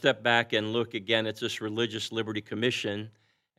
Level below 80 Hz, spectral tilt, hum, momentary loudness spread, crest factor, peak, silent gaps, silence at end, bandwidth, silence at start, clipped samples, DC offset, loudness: -82 dBFS; -4.5 dB/octave; none; 9 LU; 22 dB; -8 dBFS; none; 0.5 s; 15 kHz; 0 s; under 0.1%; under 0.1%; -29 LUFS